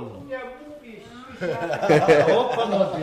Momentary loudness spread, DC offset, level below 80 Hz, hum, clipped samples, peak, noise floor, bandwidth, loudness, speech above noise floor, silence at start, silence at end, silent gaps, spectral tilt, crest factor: 25 LU; under 0.1%; -58 dBFS; none; under 0.1%; -6 dBFS; -42 dBFS; 14.5 kHz; -20 LUFS; 22 dB; 0 s; 0 s; none; -6 dB/octave; 16 dB